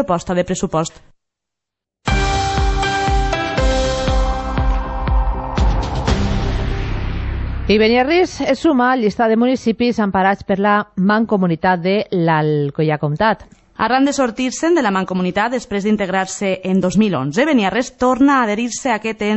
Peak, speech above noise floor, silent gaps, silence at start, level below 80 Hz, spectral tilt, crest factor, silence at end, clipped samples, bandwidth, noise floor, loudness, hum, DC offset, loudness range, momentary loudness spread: -2 dBFS; 67 dB; none; 0 s; -24 dBFS; -5.5 dB/octave; 14 dB; 0 s; under 0.1%; 8.4 kHz; -83 dBFS; -17 LUFS; none; under 0.1%; 4 LU; 7 LU